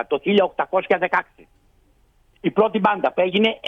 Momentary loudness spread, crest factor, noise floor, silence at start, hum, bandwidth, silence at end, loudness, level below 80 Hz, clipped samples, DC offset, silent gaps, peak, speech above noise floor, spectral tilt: 5 LU; 16 dB; -58 dBFS; 0 s; none; 6.4 kHz; 0 s; -20 LUFS; -60 dBFS; under 0.1%; under 0.1%; none; -4 dBFS; 38 dB; -7 dB/octave